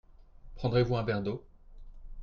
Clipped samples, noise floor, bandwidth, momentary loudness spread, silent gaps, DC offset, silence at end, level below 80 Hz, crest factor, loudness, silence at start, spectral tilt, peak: under 0.1%; -51 dBFS; 6.6 kHz; 10 LU; none; under 0.1%; 0 s; -48 dBFS; 18 dB; -31 LUFS; 0.2 s; -8.5 dB/octave; -14 dBFS